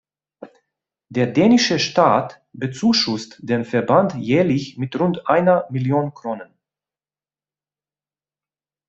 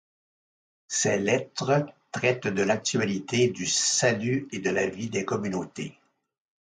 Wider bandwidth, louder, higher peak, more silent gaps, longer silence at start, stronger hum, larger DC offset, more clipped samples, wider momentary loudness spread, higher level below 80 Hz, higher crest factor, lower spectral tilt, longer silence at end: second, 7.8 kHz vs 9.6 kHz; first, -18 LUFS vs -26 LUFS; first, -2 dBFS vs -8 dBFS; neither; second, 0.4 s vs 0.9 s; neither; neither; neither; first, 13 LU vs 9 LU; about the same, -60 dBFS vs -64 dBFS; about the same, 18 dB vs 18 dB; first, -5.5 dB/octave vs -3.5 dB/octave; first, 2.45 s vs 0.75 s